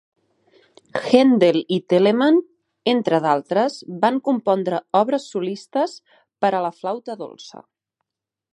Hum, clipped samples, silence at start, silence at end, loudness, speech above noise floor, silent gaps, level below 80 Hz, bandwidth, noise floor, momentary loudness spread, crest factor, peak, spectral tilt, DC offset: none; under 0.1%; 0.95 s; 0.95 s; -20 LUFS; 66 dB; none; -72 dBFS; 11 kHz; -85 dBFS; 13 LU; 20 dB; 0 dBFS; -6 dB/octave; under 0.1%